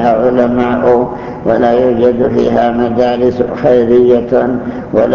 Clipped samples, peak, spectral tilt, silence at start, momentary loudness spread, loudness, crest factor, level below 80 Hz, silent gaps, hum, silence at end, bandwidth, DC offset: under 0.1%; 0 dBFS; -8.5 dB/octave; 0 s; 6 LU; -11 LUFS; 10 dB; -38 dBFS; none; none; 0 s; 6.8 kHz; under 0.1%